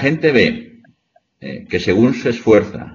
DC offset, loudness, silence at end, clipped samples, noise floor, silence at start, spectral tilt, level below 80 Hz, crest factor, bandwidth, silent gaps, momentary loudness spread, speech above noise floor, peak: under 0.1%; -15 LUFS; 0 s; under 0.1%; -60 dBFS; 0 s; -5 dB/octave; -48 dBFS; 16 dB; 7.4 kHz; none; 18 LU; 45 dB; 0 dBFS